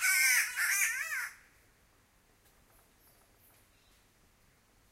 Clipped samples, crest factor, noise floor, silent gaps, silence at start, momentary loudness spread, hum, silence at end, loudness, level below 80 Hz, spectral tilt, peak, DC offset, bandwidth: under 0.1%; 20 dB; -67 dBFS; none; 0 s; 13 LU; none; 3.6 s; -29 LUFS; -72 dBFS; 3.5 dB/octave; -16 dBFS; under 0.1%; 16 kHz